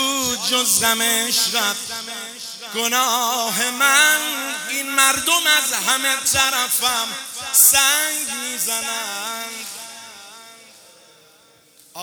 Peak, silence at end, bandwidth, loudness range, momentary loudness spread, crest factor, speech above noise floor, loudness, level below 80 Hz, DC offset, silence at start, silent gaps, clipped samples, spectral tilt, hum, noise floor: 0 dBFS; 0 s; over 20 kHz; 10 LU; 16 LU; 20 dB; 33 dB; -17 LUFS; -60 dBFS; under 0.1%; 0 s; none; under 0.1%; 1 dB/octave; none; -52 dBFS